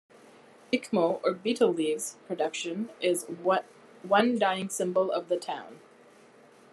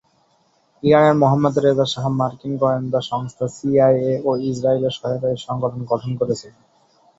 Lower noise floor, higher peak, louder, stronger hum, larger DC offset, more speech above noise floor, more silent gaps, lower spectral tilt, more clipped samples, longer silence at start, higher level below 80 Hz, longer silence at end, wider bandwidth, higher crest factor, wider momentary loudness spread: second, -56 dBFS vs -61 dBFS; second, -8 dBFS vs -2 dBFS; second, -29 LUFS vs -19 LUFS; neither; neither; second, 28 dB vs 43 dB; neither; second, -4 dB/octave vs -7 dB/octave; neither; second, 0.7 s vs 0.85 s; second, -84 dBFS vs -56 dBFS; first, 0.95 s vs 0.7 s; first, 13 kHz vs 7.8 kHz; about the same, 22 dB vs 18 dB; about the same, 9 LU vs 10 LU